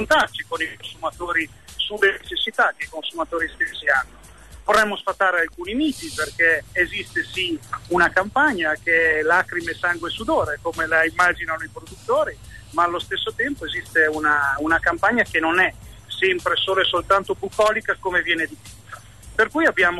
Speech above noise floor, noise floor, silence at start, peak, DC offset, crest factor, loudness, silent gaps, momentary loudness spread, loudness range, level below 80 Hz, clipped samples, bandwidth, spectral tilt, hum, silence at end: 20 dB; -42 dBFS; 0 s; -6 dBFS; 0.2%; 16 dB; -21 LUFS; none; 10 LU; 3 LU; -48 dBFS; under 0.1%; 12.5 kHz; -3.5 dB/octave; none; 0 s